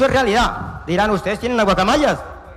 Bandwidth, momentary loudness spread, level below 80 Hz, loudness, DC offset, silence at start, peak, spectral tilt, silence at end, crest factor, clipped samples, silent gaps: 15.5 kHz; 7 LU; -34 dBFS; -17 LUFS; under 0.1%; 0 s; -4 dBFS; -5 dB/octave; 0 s; 12 dB; under 0.1%; none